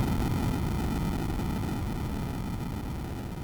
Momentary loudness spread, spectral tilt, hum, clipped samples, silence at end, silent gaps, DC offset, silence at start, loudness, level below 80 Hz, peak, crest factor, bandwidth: 7 LU; -6.5 dB/octave; none; under 0.1%; 0 s; none; under 0.1%; 0 s; -32 LUFS; -36 dBFS; -18 dBFS; 12 dB; over 20 kHz